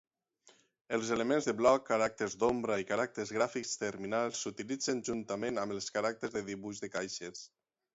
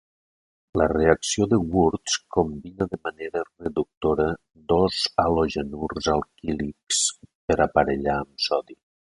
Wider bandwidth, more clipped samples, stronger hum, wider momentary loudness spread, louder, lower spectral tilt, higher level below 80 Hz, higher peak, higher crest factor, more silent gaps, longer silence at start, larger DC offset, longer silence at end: second, 8 kHz vs 11.5 kHz; neither; neither; about the same, 11 LU vs 10 LU; second, -34 LUFS vs -24 LUFS; about the same, -3.5 dB/octave vs -4 dB/octave; second, -70 dBFS vs -42 dBFS; second, -14 dBFS vs -4 dBFS; about the same, 22 dB vs 22 dB; second, none vs 3.97-4.01 s, 6.83-6.87 s, 7.35-7.48 s; first, 0.9 s vs 0.75 s; neither; first, 0.5 s vs 0.35 s